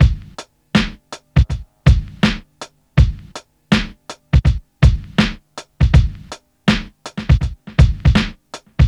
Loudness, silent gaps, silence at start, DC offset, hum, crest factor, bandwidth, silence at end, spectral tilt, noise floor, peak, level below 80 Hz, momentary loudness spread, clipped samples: -17 LUFS; none; 0 s; under 0.1%; none; 16 dB; 10 kHz; 0 s; -6.5 dB/octave; -39 dBFS; 0 dBFS; -20 dBFS; 21 LU; under 0.1%